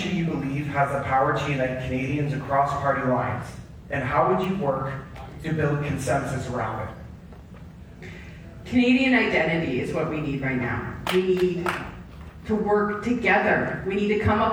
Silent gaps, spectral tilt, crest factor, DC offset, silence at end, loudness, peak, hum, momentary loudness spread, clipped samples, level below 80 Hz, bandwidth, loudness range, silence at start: none; -6.5 dB/octave; 18 dB; under 0.1%; 0 s; -24 LUFS; -8 dBFS; none; 21 LU; under 0.1%; -46 dBFS; over 20 kHz; 5 LU; 0 s